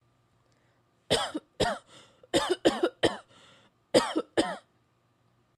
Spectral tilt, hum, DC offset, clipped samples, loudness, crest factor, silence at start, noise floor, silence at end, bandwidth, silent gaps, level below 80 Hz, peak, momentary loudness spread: -3.5 dB/octave; none; under 0.1%; under 0.1%; -29 LUFS; 24 dB; 1.1 s; -69 dBFS; 1 s; 13.5 kHz; none; -58 dBFS; -8 dBFS; 9 LU